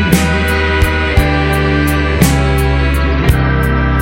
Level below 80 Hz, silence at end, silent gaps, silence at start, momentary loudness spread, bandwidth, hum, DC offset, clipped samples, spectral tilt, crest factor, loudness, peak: -16 dBFS; 0 s; none; 0 s; 2 LU; 17 kHz; none; under 0.1%; 0.3%; -5.5 dB/octave; 12 dB; -12 LUFS; 0 dBFS